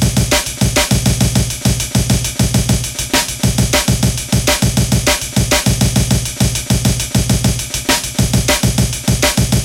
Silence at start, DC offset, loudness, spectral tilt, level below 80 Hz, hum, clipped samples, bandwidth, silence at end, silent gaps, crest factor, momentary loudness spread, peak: 0 s; under 0.1%; -14 LUFS; -4 dB/octave; -24 dBFS; none; under 0.1%; 17 kHz; 0 s; none; 12 dB; 3 LU; -2 dBFS